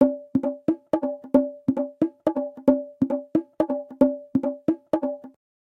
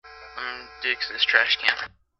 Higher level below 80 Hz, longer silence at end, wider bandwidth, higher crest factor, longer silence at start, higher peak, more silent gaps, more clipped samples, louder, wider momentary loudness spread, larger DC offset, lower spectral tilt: about the same, -58 dBFS vs -60 dBFS; first, 0.45 s vs 0.3 s; second, 4.4 kHz vs 8.6 kHz; second, 20 dB vs 26 dB; about the same, 0 s vs 0.05 s; second, -4 dBFS vs 0 dBFS; neither; neither; second, -25 LUFS vs -22 LUFS; second, 5 LU vs 15 LU; neither; first, -9.5 dB/octave vs -0.5 dB/octave